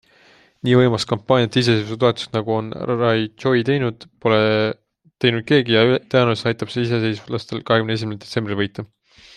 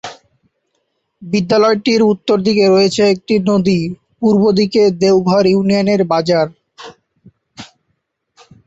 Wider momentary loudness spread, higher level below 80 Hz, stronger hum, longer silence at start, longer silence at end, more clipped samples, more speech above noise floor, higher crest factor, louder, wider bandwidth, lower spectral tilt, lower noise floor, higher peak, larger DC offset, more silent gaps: first, 10 LU vs 7 LU; about the same, -56 dBFS vs -52 dBFS; neither; first, 0.65 s vs 0.05 s; second, 0.5 s vs 1 s; neither; second, 34 dB vs 56 dB; first, 18 dB vs 12 dB; second, -19 LUFS vs -13 LUFS; first, 10.5 kHz vs 8 kHz; about the same, -6.5 dB/octave vs -6 dB/octave; second, -53 dBFS vs -68 dBFS; about the same, -2 dBFS vs -2 dBFS; neither; neither